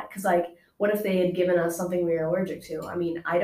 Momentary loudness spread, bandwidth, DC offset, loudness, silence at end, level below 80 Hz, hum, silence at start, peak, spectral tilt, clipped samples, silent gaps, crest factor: 8 LU; 16 kHz; under 0.1%; -26 LUFS; 0 s; -62 dBFS; none; 0 s; -12 dBFS; -6 dB/octave; under 0.1%; none; 14 dB